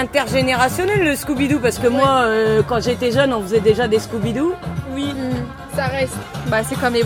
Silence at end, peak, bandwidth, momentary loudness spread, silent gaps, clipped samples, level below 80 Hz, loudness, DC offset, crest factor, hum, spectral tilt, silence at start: 0 s; 0 dBFS; 17 kHz; 9 LU; none; under 0.1%; -42 dBFS; -18 LUFS; under 0.1%; 16 dB; none; -5 dB/octave; 0 s